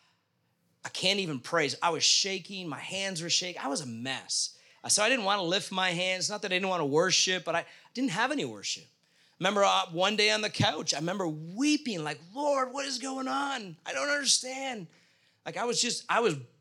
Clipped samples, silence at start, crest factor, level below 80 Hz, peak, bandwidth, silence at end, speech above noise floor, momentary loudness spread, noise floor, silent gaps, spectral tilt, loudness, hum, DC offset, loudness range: under 0.1%; 0.85 s; 22 dB; -78 dBFS; -10 dBFS; 16.5 kHz; 0.15 s; 44 dB; 11 LU; -74 dBFS; none; -2 dB/octave; -28 LUFS; none; under 0.1%; 3 LU